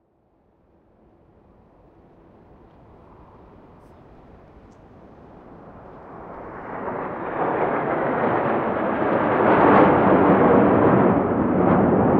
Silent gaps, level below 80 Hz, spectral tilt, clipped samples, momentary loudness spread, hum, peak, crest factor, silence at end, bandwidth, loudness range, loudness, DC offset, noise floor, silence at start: none; -48 dBFS; -11 dB/octave; under 0.1%; 19 LU; none; -2 dBFS; 18 dB; 0 s; 4.7 kHz; 19 LU; -19 LUFS; under 0.1%; -62 dBFS; 5.5 s